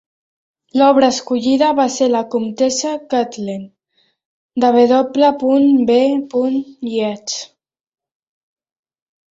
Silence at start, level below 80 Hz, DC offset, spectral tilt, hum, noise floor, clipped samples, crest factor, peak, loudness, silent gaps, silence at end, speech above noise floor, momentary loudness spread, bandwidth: 0.75 s; -62 dBFS; under 0.1%; -4 dB/octave; none; -63 dBFS; under 0.1%; 16 dB; -2 dBFS; -15 LUFS; 4.25-4.49 s; 1.9 s; 48 dB; 12 LU; 8 kHz